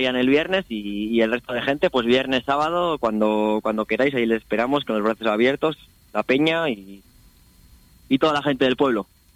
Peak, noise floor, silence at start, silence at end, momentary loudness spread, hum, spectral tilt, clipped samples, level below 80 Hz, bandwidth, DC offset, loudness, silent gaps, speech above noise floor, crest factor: -8 dBFS; -52 dBFS; 0 s; 0.3 s; 7 LU; none; -6 dB/octave; under 0.1%; -54 dBFS; 15.5 kHz; under 0.1%; -21 LUFS; none; 31 dB; 14 dB